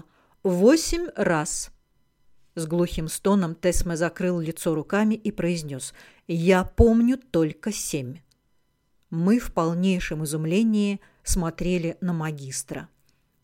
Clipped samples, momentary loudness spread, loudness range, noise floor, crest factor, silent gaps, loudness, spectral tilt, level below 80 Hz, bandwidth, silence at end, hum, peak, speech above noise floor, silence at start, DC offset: under 0.1%; 13 LU; 3 LU; -68 dBFS; 20 dB; none; -24 LUFS; -5.5 dB/octave; -38 dBFS; 16.5 kHz; 0.6 s; none; -4 dBFS; 45 dB; 0.45 s; under 0.1%